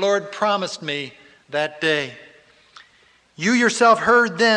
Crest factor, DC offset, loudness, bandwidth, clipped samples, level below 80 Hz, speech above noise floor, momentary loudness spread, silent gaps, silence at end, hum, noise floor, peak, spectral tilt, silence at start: 16 dB; under 0.1%; -19 LUFS; 10.5 kHz; under 0.1%; -64 dBFS; 38 dB; 13 LU; none; 0 s; none; -56 dBFS; -4 dBFS; -3.5 dB/octave; 0 s